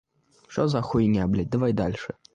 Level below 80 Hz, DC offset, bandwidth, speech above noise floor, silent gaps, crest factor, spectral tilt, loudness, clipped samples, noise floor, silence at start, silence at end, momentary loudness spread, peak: -46 dBFS; under 0.1%; 9.2 kHz; 30 dB; none; 16 dB; -8 dB/octave; -25 LUFS; under 0.1%; -54 dBFS; 0.5 s; 0.2 s; 8 LU; -10 dBFS